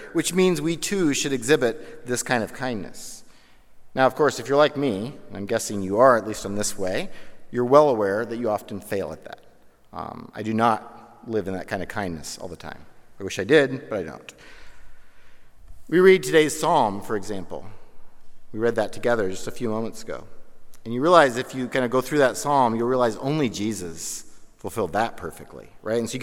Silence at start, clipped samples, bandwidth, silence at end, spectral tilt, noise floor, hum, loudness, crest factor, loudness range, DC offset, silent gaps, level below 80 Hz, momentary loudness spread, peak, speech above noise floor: 0 s; under 0.1%; 16.5 kHz; 0 s; -4.5 dB/octave; -48 dBFS; none; -23 LUFS; 22 dB; 7 LU; under 0.1%; none; -52 dBFS; 19 LU; -2 dBFS; 25 dB